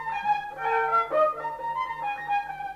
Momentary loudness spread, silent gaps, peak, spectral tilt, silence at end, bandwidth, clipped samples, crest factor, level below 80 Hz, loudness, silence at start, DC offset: 7 LU; none; -12 dBFS; -4 dB/octave; 0 s; 14 kHz; under 0.1%; 14 dB; -62 dBFS; -27 LUFS; 0 s; under 0.1%